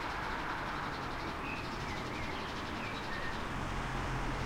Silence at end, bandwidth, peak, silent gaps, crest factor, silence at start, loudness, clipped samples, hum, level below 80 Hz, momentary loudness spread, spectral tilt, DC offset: 0 s; 16.5 kHz; -24 dBFS; none; 14 dB; 0 s; -38 LUFS; under 0.1%; none; -46 dBFS; 2 LU; -5 dB/octave; under 0.1%